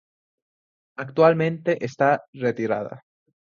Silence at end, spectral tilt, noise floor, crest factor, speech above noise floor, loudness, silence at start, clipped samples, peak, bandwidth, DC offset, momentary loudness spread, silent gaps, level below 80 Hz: 0.45 s; -7.5 dB/octave; under -90 dBFS; 20 dB; over 68 dB; -22 LUFS; 1 s; under 0.1%; -4 dBFS; 7.2 kHz; under 0.1%; 17 LU; 2.28-2.33 s; -68 dBFS